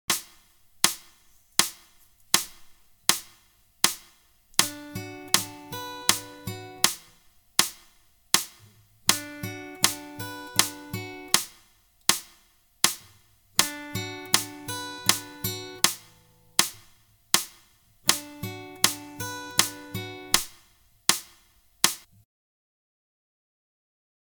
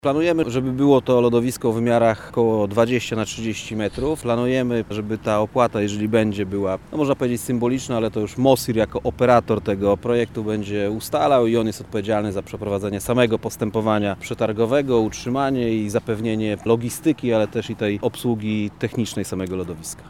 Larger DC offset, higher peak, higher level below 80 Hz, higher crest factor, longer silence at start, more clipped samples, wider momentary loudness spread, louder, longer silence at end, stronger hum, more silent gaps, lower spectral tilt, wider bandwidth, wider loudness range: second, under 0.1% vs 0.2%; about the same, 0 dBFS vs -2 dBFS; second, -62 dBFS vs -48 dBFS; first, 30 dB vs 20 dB; about the same, 0.1 s vs 0.05 s; neither; first, 13 LU vs 8 LU; second, -26 LUFS vs -21 LUFS; first, 2.25 s vs 0 s; neither; neither; second, -0.5 dB/octave vs -6 dB/octave; about the same, 19.5 kHz vs 18 kHz; second, 0 LU vs 3 LU